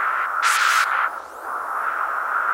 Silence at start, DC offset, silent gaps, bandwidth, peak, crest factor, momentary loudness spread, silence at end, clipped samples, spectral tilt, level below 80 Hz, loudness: 0 s; under 0.1%; none; 16 kHz; -6 dBFS; 16 dB; 12 LU; 0 s; under 0.1%; 2.5 dB/octave; -68 dBFS; -21 LUFS